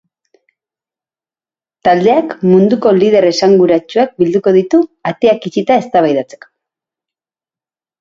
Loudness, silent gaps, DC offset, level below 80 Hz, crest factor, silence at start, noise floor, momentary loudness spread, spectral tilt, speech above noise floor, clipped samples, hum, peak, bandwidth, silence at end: -11 LUFS; none; under 0.1%; -56 dBFS; 12 dB; 1.85 s; under -90 dBFS; 6 LU; -6.5 dB/octave; over 79 dB; under 0.1%; none; 0 dBFS; 7.6 kHz; 1.8 s